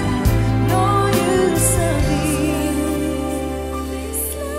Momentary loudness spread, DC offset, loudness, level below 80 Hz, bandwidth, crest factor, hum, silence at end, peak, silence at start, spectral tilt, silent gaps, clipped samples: 8 LU; under 0.1%; -19 LUFS; -28 dBFS; 16 kHz; 14 dB; none; 0 s; -4 dBFS; 0 s; -5.5 dB/octave; none; under 0.1%